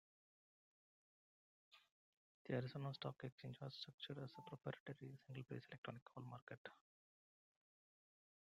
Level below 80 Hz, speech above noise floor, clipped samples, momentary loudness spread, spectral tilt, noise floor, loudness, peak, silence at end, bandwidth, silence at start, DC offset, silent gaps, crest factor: -86 dBFS; over 37 dB; under 0.1%; 10 LU; -7 dB/octave; under -90 dBFS; -53 LUFS; -32 dBFS; 1.8 s; 7.8 kHz; 1.7 s; under 0.1%; 1.92-2.45 s, 3.32-3.38 s, 3.94-3.98 s, 4.80-4.86 s, 5.78-5.83 s, 6.02-6.06 s, 6.42-6.47 s, 6.58-6.65 s; 22 dB